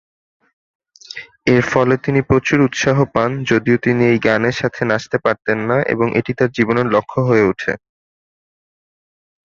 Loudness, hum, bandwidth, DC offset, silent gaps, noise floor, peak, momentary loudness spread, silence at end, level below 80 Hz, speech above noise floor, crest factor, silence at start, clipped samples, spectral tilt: -16 LUFS; none; 7.4 kHz; under 0.1%; none; -36 dBFS; 0 dBFS; 6 LU; 1.75 s; -48 dBFS; 20 dB; 16 dB; 1.15 s; under 0.1%; -6.5 dB/octave